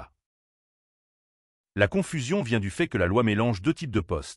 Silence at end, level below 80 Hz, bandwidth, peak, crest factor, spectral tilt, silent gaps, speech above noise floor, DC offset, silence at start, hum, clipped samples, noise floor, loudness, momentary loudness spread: 0 s; -48 dBFS; 12 kHz; -8 dBFS; 20 dB; -6 dB/octave; 0.26-1.64 s; over 65 dB; under 0.1%; 0 s; none; under 0.1%; under -90 dBFS; -26 LUFS; 6 LU